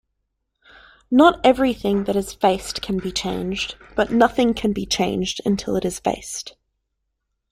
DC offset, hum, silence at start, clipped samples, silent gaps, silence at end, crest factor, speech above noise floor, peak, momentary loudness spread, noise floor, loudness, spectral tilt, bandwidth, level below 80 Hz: under 0.1%; none; 1.1 s; under 0.1%; none; 1 s; 20 dB; 56 dB; -2 dBFS; 11 LU; -76 dBFS; -20 LUFS; -4.5 dB/octave; 15.5 kHz; -46 dBFS